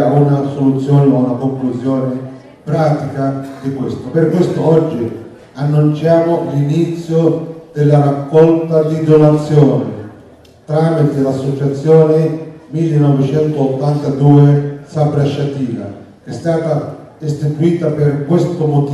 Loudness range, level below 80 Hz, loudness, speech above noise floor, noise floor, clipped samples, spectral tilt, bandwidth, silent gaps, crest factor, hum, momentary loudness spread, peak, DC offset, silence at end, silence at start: 5 LU; -50 dBFS; -13 LUFS; 29 dB; -41 dBFS; under 0.1%; -9 dB/octave; 9.6 kHz; none; 12 dB; none; 13 LU; 0 dBFS; under 0.1%; 0 s; 0 s